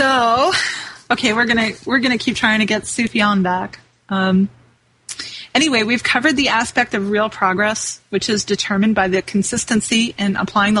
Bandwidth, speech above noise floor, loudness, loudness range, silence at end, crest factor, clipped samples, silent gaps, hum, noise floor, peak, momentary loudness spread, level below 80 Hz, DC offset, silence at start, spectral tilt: 11.5 kHz; 37 dB; -17 LUFS; 2 LU; 0 s; 16 dB; under 0.1%; none; none; -54 dBFS; -2 dBFS; 8 LU; -50 dBFS; under 0.1%; 0 s; -3.5 dB/octave